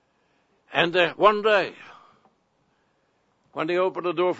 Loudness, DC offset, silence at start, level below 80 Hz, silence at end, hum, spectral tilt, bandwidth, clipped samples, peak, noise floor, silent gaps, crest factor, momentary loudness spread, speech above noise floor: -22 LUFS; under 0.1%; 0.7 s; -68 dBFS; 0 s; none; -5.5 dB/octave; 8 kHz; under 0.1%; -4 dBFS; -68 dBFS; none; 22 dB; 12 LU; 46 dB